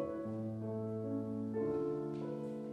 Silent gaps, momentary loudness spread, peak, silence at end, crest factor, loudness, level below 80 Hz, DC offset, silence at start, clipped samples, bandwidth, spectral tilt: none; 5 LU; -26 dBFS; 0 s; 12 dB; -40 LUFS; -72 dBFS; under 0.1%; 0 s; under 0.1%; 10 kHz; -10 dB/octave